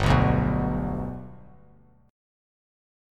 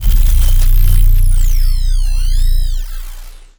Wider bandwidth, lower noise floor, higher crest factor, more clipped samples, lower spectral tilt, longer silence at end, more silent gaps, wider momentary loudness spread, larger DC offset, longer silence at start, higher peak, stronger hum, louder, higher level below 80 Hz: second, 11 kHz vs over 20 kHz; first, -56 dBFS vs -29 dBFS; first, 20 dB vs 8 dB; neither; first, -7.5 dB/octave vs -4 dB/octave; first, 1.75 s vs 0.3 s; neither; first, 19 LU vs 14 LU; neither; about the same, 0 s vs 0 s; second, -6 dBFS vs 0 dBFS; first, 50 Hz at -55 dBFS vs none; second, -25 LUFS vs -16 LUFS; second, -36 dBFS vs -10 dBFS